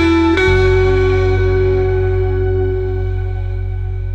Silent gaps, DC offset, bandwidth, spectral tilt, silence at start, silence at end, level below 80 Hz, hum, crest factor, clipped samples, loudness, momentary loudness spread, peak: none; 0.2%; 8 kHz; -8 dB/octave; 0 s; 0 s; -22 dBFS; none; 12 dB; under 0.1%; -15 LUFS; 10 LU; -2 dBFS